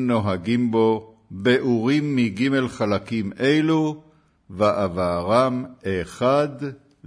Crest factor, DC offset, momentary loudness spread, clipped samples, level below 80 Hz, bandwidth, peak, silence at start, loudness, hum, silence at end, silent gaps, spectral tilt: 16 dB; under 0.1%; 9 LU; under 0.1%; -54 dBFS; 11 kHz; -6 dBFS; 0 s; -22 LUFS; none; 0 s; none; -7 dB/octave